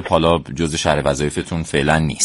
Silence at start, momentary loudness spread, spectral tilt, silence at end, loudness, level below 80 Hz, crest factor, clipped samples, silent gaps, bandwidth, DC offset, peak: 0 s; 6 LU; -4.5 dB/octave; 0 s; -18 LUFS; -34 dBFS; 18 dB; under 0.1%; none; 11.5 kHz; under 0.1%; 0 dBFS